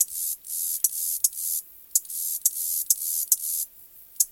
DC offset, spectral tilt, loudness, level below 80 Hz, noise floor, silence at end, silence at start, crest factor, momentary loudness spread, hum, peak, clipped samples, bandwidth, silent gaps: under 0.1%; 4.5 dB/octave; -24 LUFS; -72 dBFS; -49 dBFS; 0 s; 0 s; 24 dB; 6 LU; none; -2 dBFS; under 0.1%; 17 kHz; none